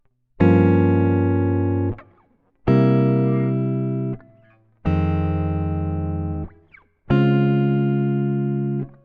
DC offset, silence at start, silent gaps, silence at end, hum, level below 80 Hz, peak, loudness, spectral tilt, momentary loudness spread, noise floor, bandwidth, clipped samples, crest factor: under 0.1%; 0.4 s; none; 0.15 s; none; -40 dBFS; -2 dBFS; -20 LUFS; -11 dB/octave; 11 LU; -59 dBFS; 4.9 kHz; under 0.1%; 18 dB